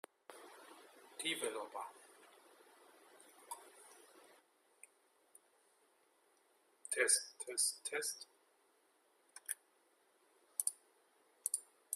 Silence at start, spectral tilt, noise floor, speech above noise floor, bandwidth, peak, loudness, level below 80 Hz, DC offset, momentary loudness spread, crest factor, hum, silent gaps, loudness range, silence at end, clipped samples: 0.3 s; 1 dB/octave; -75 dBFS; 35 dB; 15.5 kHz; -16 dBFS; -39 LUFS; under -90 dBFS; under 0.1%; 25 LU; 30 dB; none; none; 20 LU; 0 s; under 0.1%